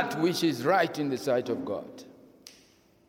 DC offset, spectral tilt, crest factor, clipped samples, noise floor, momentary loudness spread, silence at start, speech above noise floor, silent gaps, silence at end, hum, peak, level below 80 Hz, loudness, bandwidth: under 0.1%; -5 dB/octave; 18 dB; under 0.1%; -61 dBFS; 13 LU; 0 s; 33 dB; none; 0.6 s; none; -12 dBFS; -74 dBFS; -28 LUFS; 17.5 kHz